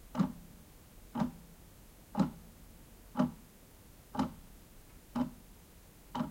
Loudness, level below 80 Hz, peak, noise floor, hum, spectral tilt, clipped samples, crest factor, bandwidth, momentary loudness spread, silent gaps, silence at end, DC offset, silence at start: -38 LUFS; -58 dBFS; -16 dBFS; -57 dBFS; none; -7 dB/octave; under 0.1%; 24 dB; 16.5 kHz; 22 LU; none; 0 s; under 0.1%; 0 s